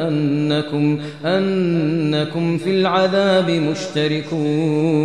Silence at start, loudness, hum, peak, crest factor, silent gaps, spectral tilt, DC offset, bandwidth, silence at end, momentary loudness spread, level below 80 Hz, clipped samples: 0 s; -18 LUFS; none; -4 dBFS; 14 dB; none; -6.5 dB/octave; 0.3%; 10 kHz; 0 s; 5 LU; -60 dBFS; under 0.1%